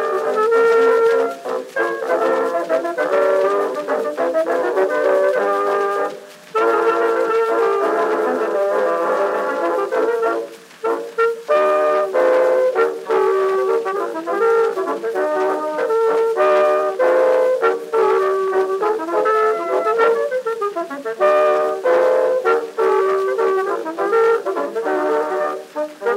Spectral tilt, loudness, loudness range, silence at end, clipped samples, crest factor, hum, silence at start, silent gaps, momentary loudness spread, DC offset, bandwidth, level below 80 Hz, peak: -4 dB/octave; -18 LUFS; 2 LU; 0 s; under 0.1%; 14 dB; none; 0 s; none; 7 LU; under 0.1%; 15.5 kHz; -84 dBFS; -2 dBFS